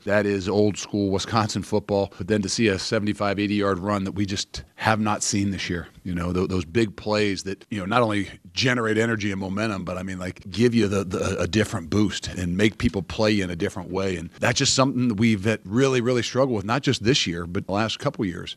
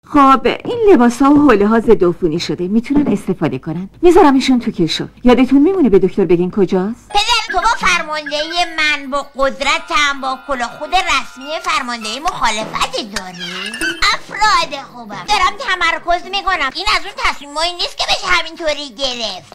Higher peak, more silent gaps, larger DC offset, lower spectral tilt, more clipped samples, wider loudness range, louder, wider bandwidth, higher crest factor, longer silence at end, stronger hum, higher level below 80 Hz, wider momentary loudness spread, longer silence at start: about the same, -2 dBFS vs 0 dBFS; neither; neither; about the same, -5 dB/octave vs -4 dB/octave; neither; about the same, 3 LU vs 5 LU; second, -24 LUFS vs -14 LUFS; second, 13.5 kHz vs 15 kHz; first, 22 dB vs 14 dB; second, 0 s vs 0.15 s; neither; second, -48 dBFS vs -34 dBFS; second, 8 LU vs 11 LU; about the same, 0.05 s vs 0.1 s